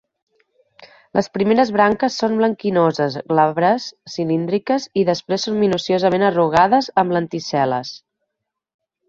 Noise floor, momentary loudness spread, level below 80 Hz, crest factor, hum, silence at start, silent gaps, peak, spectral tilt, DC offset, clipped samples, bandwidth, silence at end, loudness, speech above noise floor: -79 dBFS; 7 LU; -58 dBFS; 18 dB; none; 0.8 s; none; -2 dBFS; -5.5 dB/octave; under 0.1%; under 0.1%; 7.8 kHz; 1.1 s; -18 LUFS; 62 dB